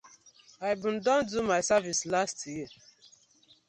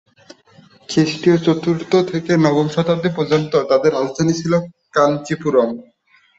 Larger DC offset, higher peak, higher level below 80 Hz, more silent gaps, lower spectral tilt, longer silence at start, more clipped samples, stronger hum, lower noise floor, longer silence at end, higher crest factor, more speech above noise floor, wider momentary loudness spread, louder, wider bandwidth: neither; second, -12 dBFS vs -2 dBFS; second, -66 dBFS vs -56 dBFS; neither; second, -3 dB/octave vs -6.5 dB/octave; second, 0.05 s vs 0.9 s; neither; neither; first, -63 dBFS vs -49 dBFS; first, 0.95 s vs 0.55 s; about the same, 18 dB vs 16 dB; about the same, 34 dB vs 33 dB; first, 13 LU vs 5 LU; second, -29 LUFS vs -17 LUFS; first, 10.5 kHz vs 8 kHz